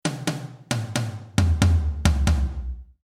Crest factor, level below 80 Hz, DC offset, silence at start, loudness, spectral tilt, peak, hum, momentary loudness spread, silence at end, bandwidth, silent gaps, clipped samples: 20 dB; -28 dBFS; under 0.1%; 0.05 s; -24 LUFS; -5.5 dB/octave; -2 dBFS; none; 11 LU; 0.2 s; 15 kHz; none; under 0.1%